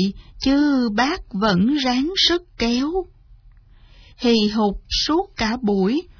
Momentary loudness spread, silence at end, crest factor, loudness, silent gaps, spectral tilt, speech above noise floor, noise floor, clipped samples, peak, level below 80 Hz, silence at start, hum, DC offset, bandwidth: 7 LU; 0.1 s; 16 dB; -19 LUFS; none; -5 dB/octave; 28 dB; -48 dBFS; under 0.1%; -6 dBFS; -40 dBFS; 0 s; none; under 0.1%; 5.4 kHz